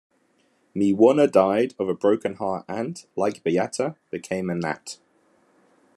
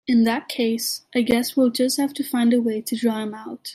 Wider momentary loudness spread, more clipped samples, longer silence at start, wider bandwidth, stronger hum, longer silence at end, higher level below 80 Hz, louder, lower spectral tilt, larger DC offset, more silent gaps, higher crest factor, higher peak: first, 15 LU vs 6 LU; neither; first, 0.75 s vs 0.05 s; second, 12.5 kHz vs 15.5 kHz; neither; first, 1.05 s vs 0 s; second, -72 dBFS vs -60 dBFS; about the same, -23 LUFS vs -22 LUFS; first, -6 dB/octave vs -4 dB/octave; neither; neither; about the same, 20 dB vs 16 dB; about the same, -4 dBFS vs -6 dBFS